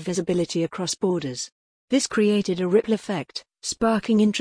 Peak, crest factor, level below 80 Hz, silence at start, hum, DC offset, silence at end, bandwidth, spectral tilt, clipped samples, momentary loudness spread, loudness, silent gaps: -8 dBFS; 16 dB; -58 dBFS; 0 s; none; under 0.1%; 0 s; 10.5 kHz; -5 dB/octave; under 0.1%; 11 LU; -24 LUFS; 1.52-1.88 s